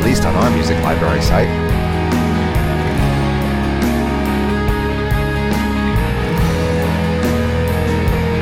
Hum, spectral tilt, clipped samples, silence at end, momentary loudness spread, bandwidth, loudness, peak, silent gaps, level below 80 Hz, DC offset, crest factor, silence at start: none; -6.5 dB/octave; under 0.1%; 0 s; 3 LU; 16.5 kHz; -16 LUFS; -2 dBFS; none; -22 dBFS; under 0.1%; 14 dB; 0 s